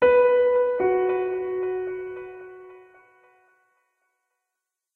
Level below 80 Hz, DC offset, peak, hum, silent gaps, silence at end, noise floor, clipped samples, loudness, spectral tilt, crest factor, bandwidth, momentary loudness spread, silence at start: -60 dBFS; under 0.1%; -8 dBFS; none; none; 2.2 s; -84 dBFS; under 0.1%; -23 LUFS; -8 dB/octave; 16 dB; 4 kHz; 21 LU; 0 s